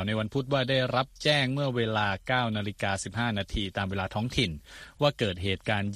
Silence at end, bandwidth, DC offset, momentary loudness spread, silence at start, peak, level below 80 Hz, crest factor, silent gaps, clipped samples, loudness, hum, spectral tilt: 0 s; 14 kHz; under 0.1%; 6 LU; 0 s; -10 dBFS; -48 dBFS; 18 dB; none; under 0.1%; -28 LUFS; none; -5 dB/octave